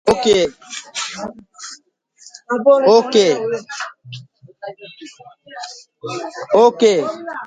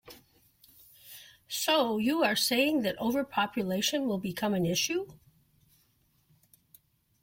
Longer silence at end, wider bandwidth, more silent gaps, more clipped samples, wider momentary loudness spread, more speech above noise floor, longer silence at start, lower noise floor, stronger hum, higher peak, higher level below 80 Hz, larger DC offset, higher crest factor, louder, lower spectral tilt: second, 0 s vs 2.05 s; second, 10.5 kHz vs 16.5 kHz; neither; neither; first, 24 LU vs 18 LU; second, 30 dB vs 41 dB; about the same, 0.05 s vs 0.05 s; second, -47 dBFS vs -70 dBFS; neither; first, 0 dBFS vs -14 dBFS; first, -56 dBFS vs -68 dBFS; neither; about the same, 18 dB vs 18 dB; first, -16 LUFS vs -29 LUFS; about the same, -3.5 dB/octave vs -3.5 dB/octave